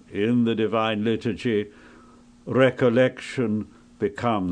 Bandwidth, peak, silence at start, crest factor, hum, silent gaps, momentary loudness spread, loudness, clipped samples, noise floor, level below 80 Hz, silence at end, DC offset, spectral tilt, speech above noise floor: 9.8 kHz; -6 dBFS; 0.1 s; 18 dB; none; none; 10 LU; -23 LUFS; under 0.1%; -51 dBFS; -58 dBFS; 0 s; under 0.1%; -7 dB/octave; 28 dB